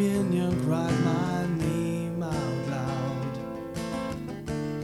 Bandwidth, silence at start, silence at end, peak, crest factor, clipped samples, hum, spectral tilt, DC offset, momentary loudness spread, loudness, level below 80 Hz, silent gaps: 15 kHz; 0 s; 0 s; -14 dBFS; 14 dB; under 0.1%; 50 Hz at -45 dBFS; -7 dB/octave; under 0.1%; 9 LU; -29 LUFS; -50 dBFS; none